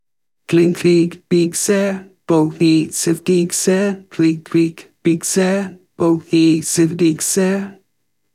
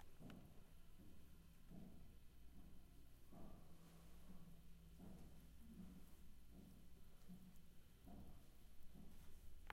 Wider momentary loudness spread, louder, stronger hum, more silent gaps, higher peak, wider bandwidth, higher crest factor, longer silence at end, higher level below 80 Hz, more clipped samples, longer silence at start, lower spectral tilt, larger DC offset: about the same, 7 LU vs 6 LU; first, -16 LUFS vs -66 LUFS; neither; neither; first, -4 dBFS vs -36 dBFS; about the same, 15.5 kHz vs 16 kHz; second, 12 dB vs 22 dB; first, 0.6 s vs 0 s; about the same, -60 dBFS vs -64 dBFS; neither; first, 0.5 s vs 0 s; about the same, -5 dB/octave vs -5.5 dB/octave; neither